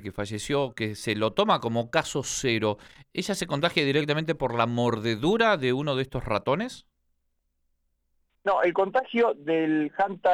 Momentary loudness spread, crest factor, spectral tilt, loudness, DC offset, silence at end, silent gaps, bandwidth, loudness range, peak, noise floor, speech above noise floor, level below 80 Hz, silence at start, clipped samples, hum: 8 LU; 20 dB; -5 dB/octave; -26 LUFS; under 0.1%; 0 s; none; 16 kHz; 4 LU; -6 dBFS; -74 dBFS; 49 dB; -54 dBFS; 0 s; under 0.1%; none